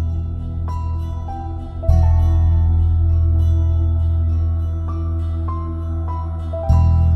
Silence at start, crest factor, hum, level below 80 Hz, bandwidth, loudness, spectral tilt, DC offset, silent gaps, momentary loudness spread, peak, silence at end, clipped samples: 0 s; 14 dB; none; -24 dBFS; 2.9 kHz; -19 LUFS; -10 dB/octave; under 0.1%; none; 10 LU; -2 dBFS; 0 s; under 0.1%